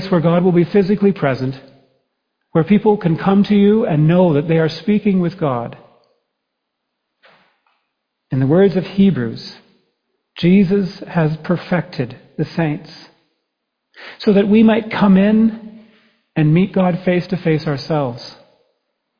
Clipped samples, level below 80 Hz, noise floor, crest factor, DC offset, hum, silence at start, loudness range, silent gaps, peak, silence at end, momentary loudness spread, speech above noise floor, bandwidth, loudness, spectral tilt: under 0.1%; -50 dBFS; -75 dBFS; 16 dB; under 0.1%; none; 0 s; 7 LU; none; -2 dBFS; 0.85 s; 13 LU; 61 dB; 5.2 kHz; -15 LUFS; -9.5 dB/octave